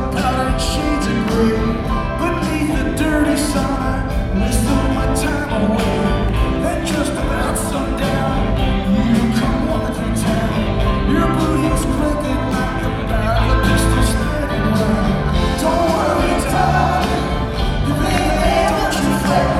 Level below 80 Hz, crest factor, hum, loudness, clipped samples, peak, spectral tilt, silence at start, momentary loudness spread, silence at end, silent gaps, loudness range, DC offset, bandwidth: -22 dBFS; 16 dB; none; -17 LUFS; under 0.1%; 0 dBFS; -5.5 dB/octave; 0 s; 4 LU; 0 s; none; 2 LU; under 0.1%; 15 kHz